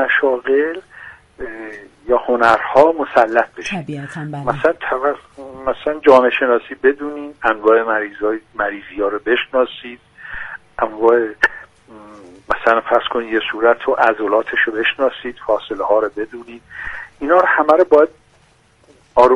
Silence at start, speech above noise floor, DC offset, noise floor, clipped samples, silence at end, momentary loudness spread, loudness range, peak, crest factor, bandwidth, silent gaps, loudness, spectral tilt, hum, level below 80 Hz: 0 s; 37 dB; under 0.1%; -53 dBFS; under 0.1%; 0 s; 17 LU; 3 LU; 0 dBFS; 16 dB; 10.5 kHz; none; -16 LUFS; -5.5 dB/octave; none; -48 dBFS